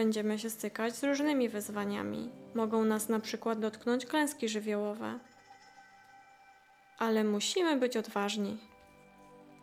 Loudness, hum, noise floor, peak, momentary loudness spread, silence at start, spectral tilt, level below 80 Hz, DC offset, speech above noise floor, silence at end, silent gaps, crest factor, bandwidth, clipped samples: -33 LUFS; none; -61 dBFS; -18 dBFS; 9 LU; 0 s; -4 dB/octave; -82 dBFS; under 0.1%; 29 dB; 0.05 s; none; 16 dB; 16.5 kHz; under 0.1%